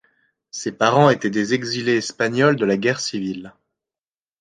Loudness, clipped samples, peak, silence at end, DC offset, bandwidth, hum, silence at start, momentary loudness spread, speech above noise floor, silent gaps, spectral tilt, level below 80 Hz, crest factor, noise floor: -19 LUFS; under 0.1%; -2 dBFS; 0.9 s; under 0.1%; 9.8 kHz; none; 0.55 s; 14 LU; over 71 dB; none; -5 dB/octave; -62 dBFS; 20 dB; under -90 dBFS